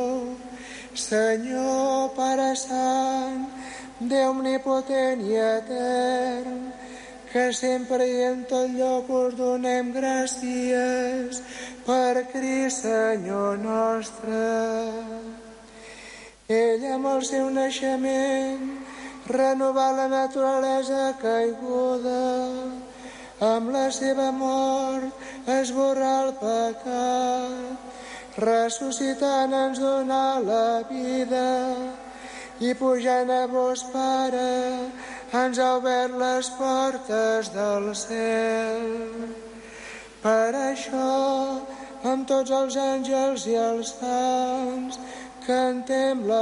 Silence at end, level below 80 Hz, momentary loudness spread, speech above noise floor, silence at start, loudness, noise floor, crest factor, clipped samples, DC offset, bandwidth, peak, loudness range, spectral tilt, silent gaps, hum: 0 s; -62 dBFS; 14 LU; 20 dB; 0 s; -25 LUFS; -45 dBFS; 14 dB; under 0.1%; under 0.1%; 11.5 kHz; -12 dBFS; 2 LU; -3.5 dB/octave; none; none